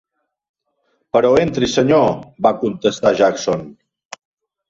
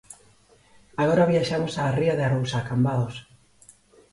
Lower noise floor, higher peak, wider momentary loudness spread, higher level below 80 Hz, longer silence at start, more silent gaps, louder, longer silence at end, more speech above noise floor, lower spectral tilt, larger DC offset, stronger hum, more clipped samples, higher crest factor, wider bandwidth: first, -67 dBFS vs -57 dBFS; first, -2 dBFS vs -8 dBFS; second, 6 LU vs 10 LU; first, -50 dBFS vs -56 dBFS; first, 1.15 s vs 0.1 s; neither; first, -16 LUFS vs -24 LUFS; about the same, 0.95 s vs 0.9 s; first, 51 dB vs 35 dB; about the same, -5.5 dB/octave vs -6.5 dB/octave; neither; neither; neither; about the same, 16 dB vs 16 dB; second, 7.8 kHz vs 11.5 kHz